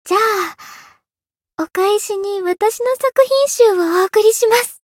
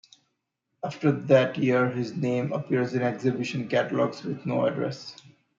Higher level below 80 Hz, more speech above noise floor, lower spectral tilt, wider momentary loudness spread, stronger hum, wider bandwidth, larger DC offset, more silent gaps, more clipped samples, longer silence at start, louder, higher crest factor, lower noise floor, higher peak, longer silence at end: about the same, -68 dBFS vs -72 dBFS; first, over 76 dB vs 54 dB; second, -1 dB/octave vs -7 dB/octave; second, 9 LU vs 12 LU; neither; first, 17 kHz vs 7.6 kHz; neither; neither; neither; second, 0.05 s vs 0.85 s; first, -15 LUFS vs -26 LUFS; about the same, 16 dB vs 20 dB; first, under -90 dBFS vs -79 dBFS; first, 0 dBFS vs -6 dBFS; second, 0.2 s vs 0.45 s